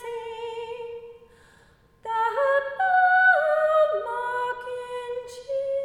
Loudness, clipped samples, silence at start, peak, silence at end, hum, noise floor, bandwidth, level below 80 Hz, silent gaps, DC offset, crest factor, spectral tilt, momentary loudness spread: -23 LUFS; under 0.1%; 0 s; -10 dBFS; 0 s; none; -57 dBFS; 12 kHz; -64 dBFS; none; under 0.1%; 16 dB; -2.5 dB/octave; 17 LU